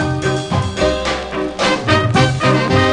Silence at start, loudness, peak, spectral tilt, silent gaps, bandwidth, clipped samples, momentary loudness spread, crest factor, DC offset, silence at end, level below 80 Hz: 0 s; -16 LUFS; 0 dBFS; -5.5 dB/octave; none; 10.5 kHz; under 0.1%; 6 LU; 14 dB; under 0.1%; 0 s; -32 dBFS